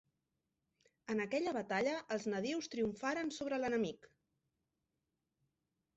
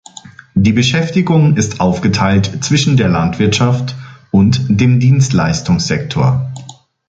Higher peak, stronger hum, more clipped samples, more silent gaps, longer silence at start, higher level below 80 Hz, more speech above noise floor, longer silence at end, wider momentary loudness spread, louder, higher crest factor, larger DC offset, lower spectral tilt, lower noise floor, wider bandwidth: second, -24 dBFS vs 0 dBFS; neither; neither; neither; first, 1.1 s vs 0.25 s; second, -76 dBFS vs -36 dBFS; first, 50 dB vs 25 dB; first, 2 s vs 0.35 s; about the same, 5 LU vs 7 LU; second, -39 LUFS vs -13 LUFS; about the same, 16 dB vs 12 dB; neither; second, -3.5 dB/octave vs -6 dB/octave; first, -88 dBFS vs -36 dBFS; second, 8 kHz vs 9 kHz